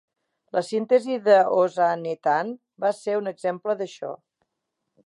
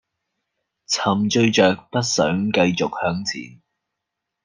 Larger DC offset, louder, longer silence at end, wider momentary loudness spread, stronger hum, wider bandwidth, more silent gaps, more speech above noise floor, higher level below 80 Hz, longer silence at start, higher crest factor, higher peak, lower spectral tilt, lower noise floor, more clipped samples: neither; second, -23 LUFS vs -20 LUFS; about the same, 0.9 s vs 0.95 s; first, 14 LU vs 8 LU; neither; about the same, 11.5 kHz vs 10.5 kHz; neither; second, 58 dB vs 62 dB; second, -82 dBFS vs -60 dBFS; second, 0.55 s vs 0.9 s; about the same, 18 dB vs 20 dB; second, -6 dBFS vs -2 dBFS; about the same, -5.5 dB/octave vs -4.5 dB/octave; about the same, -81 dBFS vs -81 dBFS; neither